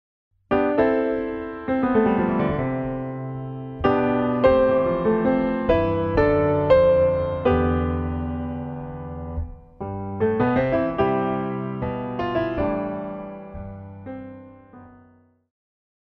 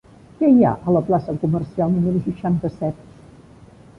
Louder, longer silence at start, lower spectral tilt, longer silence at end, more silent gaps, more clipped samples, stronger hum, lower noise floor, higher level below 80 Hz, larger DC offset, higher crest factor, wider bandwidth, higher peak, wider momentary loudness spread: second, -22 LUFS vs -19 LUFS; about the same, 0.5 s vs 0.4 s; about the same, -10 dB/octave vs -11 dB/octave; about the same, 1.15 s vs 1.05 s; neither; neither; neither; first, -56 dBFS vs -45 dBFS; first, -40 dBFS vs -48 dBFS; neither; about the same, 18 dB vs 16 dB; about the same, 5.4 kHz vs 5.6 kHz; about the same, -4 dBFS vs -4 dBFS; first, 15 LU vs 11 LU